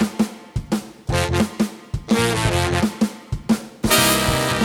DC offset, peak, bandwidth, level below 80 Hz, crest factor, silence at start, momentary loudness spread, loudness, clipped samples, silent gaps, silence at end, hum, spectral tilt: under 0.1%; 0 dBFS; 19 kHz; -36 dBFS; 20 dB; 0 s; 10 LU; -20 LUFS; under 0.1%; none; 0 s; none; -4 dB/octave